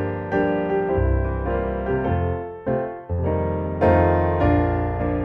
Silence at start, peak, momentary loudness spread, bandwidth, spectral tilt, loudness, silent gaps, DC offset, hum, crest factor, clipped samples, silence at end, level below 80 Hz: 0 s; -6 dBFS; 8 LU; 4.7 kHz; -10.5 dB/octave; -22 LUFS; none; under 0.1%; none; 16 dB; under 0.1%; 0 s; -30 dBFS